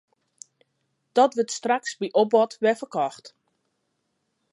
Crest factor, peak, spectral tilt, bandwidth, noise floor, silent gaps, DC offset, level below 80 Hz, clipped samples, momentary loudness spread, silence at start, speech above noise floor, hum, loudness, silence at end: 20 dB; -6 dBFS; -3.5 dB/octave; 11.5 kHz; -75 dBFS; none; under 0.1%; -84 dBFS; under 0.1%; 7 LU; 1.15 s; 53 dB; none; -23 LUFS; 1.25 s